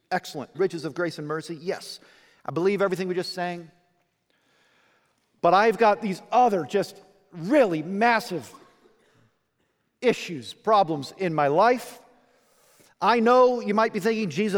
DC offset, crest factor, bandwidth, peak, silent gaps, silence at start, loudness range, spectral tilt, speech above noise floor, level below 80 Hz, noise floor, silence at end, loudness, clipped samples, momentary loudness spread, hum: under 0.1%; 18 dB; 19.5 kHz; -6 dBFS; none; 0.1 s; 7 LU; -5.5 dB/octave; 49 dB; -74 dBFS; -72 dBFS; 0 s; -24 LUFS; under 0.1%; 15 LU; none